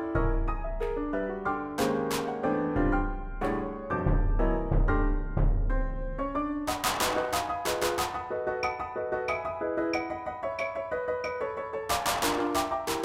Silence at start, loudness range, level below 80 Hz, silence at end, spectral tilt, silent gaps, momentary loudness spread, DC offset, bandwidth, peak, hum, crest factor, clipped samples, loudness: 0 s; 2 LU; -34 dBFS; 0 s; -5 dB/octave; none; 6 LU; under 0.1%; 16.5 kHz; -12 dBFS; none; 16 dB; under 0.1%; -30 LUFS